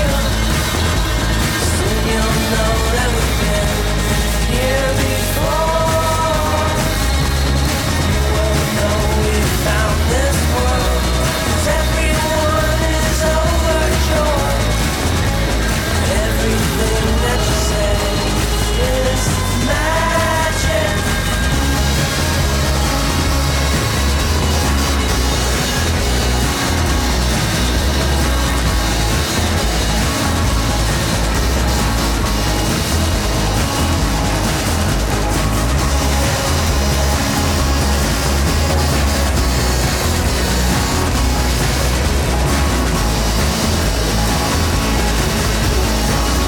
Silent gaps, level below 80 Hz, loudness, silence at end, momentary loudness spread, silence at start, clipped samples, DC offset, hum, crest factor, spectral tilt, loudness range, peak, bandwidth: none; -20 dBFS; -16 LUFS; 0 s; 1 LU; 0 s; under 0.1%; under 0.1%; none; 10 dB; -4 dB/octave; 1 LU; -4 dBFS; 19 kHz